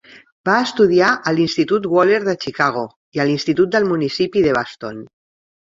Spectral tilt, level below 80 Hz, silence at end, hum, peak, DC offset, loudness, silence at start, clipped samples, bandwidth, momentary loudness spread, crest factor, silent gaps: -5.5 dB/octave; -56 dBFS; 0.75 s; none; 0 dBFS; under 0.1%; -17 LUFS; 0.15 s; under 0.1%; 7.8 kHz; 12 LU; 16 dB; 0.32-0.44 s, 2.96-3.12 s